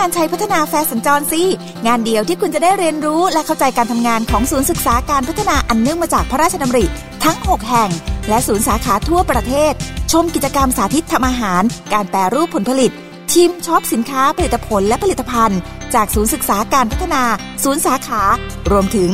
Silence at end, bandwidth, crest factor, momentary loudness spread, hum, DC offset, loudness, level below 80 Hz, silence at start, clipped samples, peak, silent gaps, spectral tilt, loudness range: 0 s; 16.5 kHz; 14 dB; 3 LU; none; 1%; -15 LUFS; -28 dBFS; 0 s; under 0.1%; 0 dBFS; none; -4 dB/octave; 1 LU